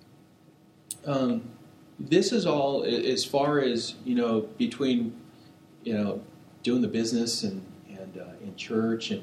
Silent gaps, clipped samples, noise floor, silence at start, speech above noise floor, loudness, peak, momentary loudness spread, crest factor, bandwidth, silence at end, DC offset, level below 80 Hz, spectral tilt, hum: none; under 0.1%; -57 dBFS; 0.9 s; 30 dB; -27 LUFS; -10 dBFS; 17 LU; 20 dB; 15.5 kHz; 0 s; under 0.1%; -72 dBFS; -5 dB/octave; none